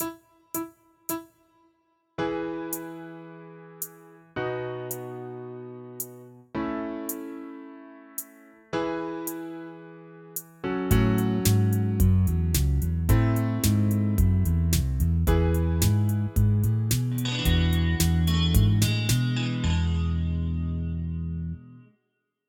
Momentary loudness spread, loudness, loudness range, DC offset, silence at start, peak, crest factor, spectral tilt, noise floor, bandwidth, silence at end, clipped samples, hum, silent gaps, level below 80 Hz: 17 LU; -26 LUFS; 12 LU; under 0.1%; 0 s; -8 dBFS; 18 dB; -5.5 dB/octave; -78 dBFS; 19 kHz; 0.7 s; under 0.1%; none; none; -34 dBFS